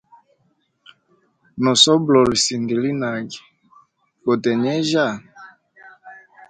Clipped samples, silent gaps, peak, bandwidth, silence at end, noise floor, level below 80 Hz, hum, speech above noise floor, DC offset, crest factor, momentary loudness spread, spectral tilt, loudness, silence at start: under 0.1%; none; 0 dBFS; 9.6 kHz; 0.3 s; -66 dBFS; -56 dBFS; none; 48 dB; under 0.1%; 20 dB; 19 LU; -3.5 dB/octave; -18 LUFS; 1.55 s